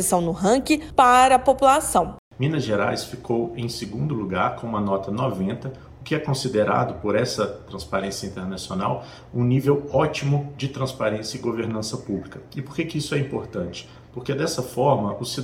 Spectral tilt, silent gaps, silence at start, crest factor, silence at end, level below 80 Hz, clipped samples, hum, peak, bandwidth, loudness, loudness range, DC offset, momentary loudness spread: -5 dB/octave; 2.18-2.31 s; 0 s; 20 dB; 0 s; -48 dBFS; under 0.1%; none; -4 dBFS; 16.5 kHz; -23 LUFS; 8 LU; under 0.1%; 14 LU